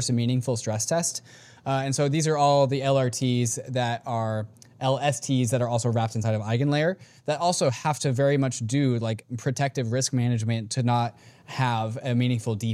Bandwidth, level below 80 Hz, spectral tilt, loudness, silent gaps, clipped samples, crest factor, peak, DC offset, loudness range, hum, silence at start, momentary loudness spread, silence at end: 14.5 kHz; -66 dBFS; -5.5 dB/octave; -25 LUFS; none; under 0.1%; 16 dB; -10 dBFS; under 0.1%; 2 LU; none; 0 s; 7 LU; 0 s